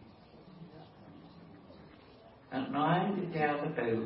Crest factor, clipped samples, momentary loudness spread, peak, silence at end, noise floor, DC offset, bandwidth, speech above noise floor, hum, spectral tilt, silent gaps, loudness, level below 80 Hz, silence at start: 20 dB; under 0.1%; 25 LU; -18 dBFS; 0 s; -57 dBFS; under 0.1%; 5.6 kHz; 25 dB; none; -5.5 dB/octave; none; -33 LUFS; -70 dBFS; 0 s